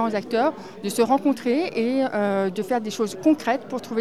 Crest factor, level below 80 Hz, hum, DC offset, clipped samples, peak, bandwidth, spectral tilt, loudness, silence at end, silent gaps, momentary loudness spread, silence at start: 16 dB; -70 dBFS; none; 0.3%; under 0.1%; -8 dBFS; 14.5 kHz; -5 dB/octave; -23 LUFS; 0 s; none; 7 LU; 0 s